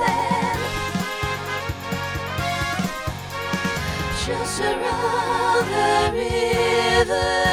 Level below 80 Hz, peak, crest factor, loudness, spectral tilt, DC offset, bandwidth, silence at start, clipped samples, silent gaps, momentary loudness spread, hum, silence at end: -38 dBFS; -6 dBFS; 16 dB; -22 LUFS; -4 dB/octave; under 0.1%; over 20 kHz; 0 s; under 0.1%; none; 8 LU; none; 0 s